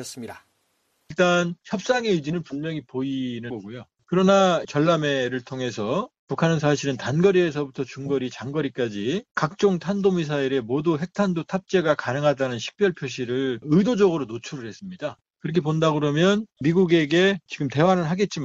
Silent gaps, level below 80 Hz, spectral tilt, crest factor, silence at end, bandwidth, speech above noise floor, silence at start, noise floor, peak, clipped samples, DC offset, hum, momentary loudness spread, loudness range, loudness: 6.19-6.27 s, 9.31-9.35 s; -60 dBFS; -6 dB/octave; 16 dB; 0 s; 11 kHz; 47 dB; 0 s; -70 dBFS; -6 dBFS; under 0.1%; under 0.1%; none; 13 LU; 3 LU; -23 LUFS